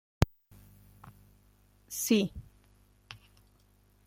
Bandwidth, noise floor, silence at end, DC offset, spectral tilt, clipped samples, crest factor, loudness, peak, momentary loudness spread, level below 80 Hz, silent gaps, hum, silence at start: 16.5 kHz; -65 dBFS; 0.9 s; under 0.1%; -5 dB/octave; under 0.1%; 28 dB; -31 LUFS; -8 dBFS; 28 LU; -50 dBFS; none; 50 Hz at -55 dBFS; 0.2 s